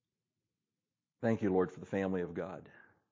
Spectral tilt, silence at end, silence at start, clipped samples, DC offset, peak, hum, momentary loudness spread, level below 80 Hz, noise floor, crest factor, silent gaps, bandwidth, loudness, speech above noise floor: -8.5 dB/octave; 0.4 s; 1.2 s; under 0.1%; under 0.1%; -18 dBFS; none; 12 LU; -66 dBFS; under -90 dBFS; 20 dB; none; 7.6 kHz; -36 LUFS; over 55 dB